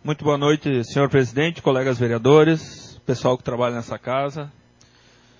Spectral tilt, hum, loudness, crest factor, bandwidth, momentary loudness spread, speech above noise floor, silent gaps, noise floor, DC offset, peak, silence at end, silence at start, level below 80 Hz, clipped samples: -6.5 dB/octave; none; -20 LUFS; 18 dB; 7.6 kHz; 14 LU; 34 dB; none; -54 dBFS; under 0.1%; -2 dBFS; 0.9 s; 0.05 s; -54 dBFS; under 0.1%